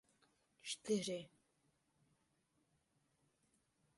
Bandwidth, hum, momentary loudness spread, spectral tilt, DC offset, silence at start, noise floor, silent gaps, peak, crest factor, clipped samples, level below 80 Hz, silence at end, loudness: 11.5 kHz; none; 15 LU; -4 dB/octave; under 0.1%; 0.65 s; -82 dBFS; none; -28 dBFS; 22 dB; under 0.1%; -88 dBFS; 2.7 s; -43 LUFS